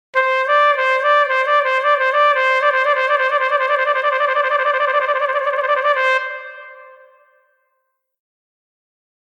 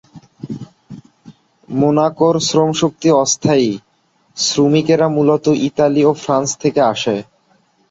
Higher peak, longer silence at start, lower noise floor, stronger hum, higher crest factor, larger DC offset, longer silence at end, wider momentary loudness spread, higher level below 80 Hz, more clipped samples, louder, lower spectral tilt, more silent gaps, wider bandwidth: about the same, -4 dBFS vs -2 dBFS; about the same, 0.15 s vs 0.15 s; first, -71 dBFS vs -59 dBFS; neither; about the same, 14 dB vs 14 dB; neither; first, 2.35 s vs 0.7 s; second, 4 LU vs 17 LU; second, -84 dBFS vs -56 dBFS; neither; about the same, -15 LUFS vs -15 LUFS; second, 1.5 dB/octave vs -5 dB/octave; neither; first, 9.4 kHz vs 8 kHz